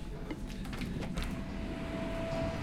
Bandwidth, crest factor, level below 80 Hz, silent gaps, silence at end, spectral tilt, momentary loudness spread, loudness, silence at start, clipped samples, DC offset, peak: 16 kHz; 14 dB; -44 dBFS; none; 0 s; -6.5 dB/octave; 6 LU; -39 LUFS; 0 s; under 0.1%; under 0.1%; -24 dBFS